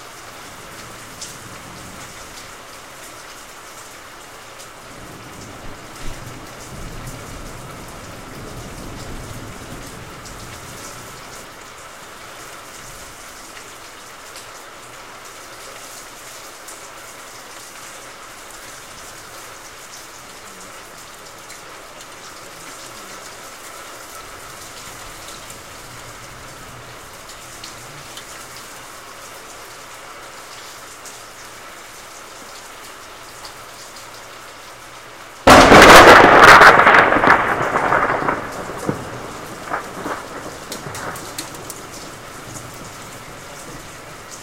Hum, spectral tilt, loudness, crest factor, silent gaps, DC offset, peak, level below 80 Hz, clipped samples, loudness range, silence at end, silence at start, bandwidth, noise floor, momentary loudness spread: none; -3 dB/octave; -10 LUFS; 20 dB; none; 0.3%; 0 dBFS; -40 dBFS; 0.1%; 27 LU; 0.65 s; 1.2 s; 16.5 kHz; -38 dBFS; 19 LU